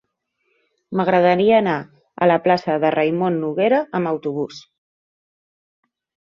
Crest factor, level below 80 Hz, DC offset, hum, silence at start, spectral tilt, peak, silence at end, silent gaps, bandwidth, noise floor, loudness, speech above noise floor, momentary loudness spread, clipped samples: 18 dB; -64 dBFS; under 0.1%; none; 0.9 s; -7.5 dB/octave; -2 dBFS; 1.7 s; none; 7.2 kHz; -71 dBFS; -18 LUFS; 53 dB; 11 LU; under 0.1%